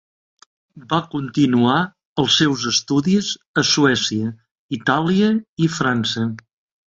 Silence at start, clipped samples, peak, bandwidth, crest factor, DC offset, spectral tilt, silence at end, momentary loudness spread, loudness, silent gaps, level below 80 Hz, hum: 0.75 s; under 0.1%; -4 dBFS; 8 kHz; 16 dB; under 0.1%; -4.5 dB/octave; 0.5 s; 9 LU; -18 LUFS; 2.05-2.16 s, 3.47-3.54 s, 4.51-4.69 s, 5.49-5.57 s; -56 dBFS; none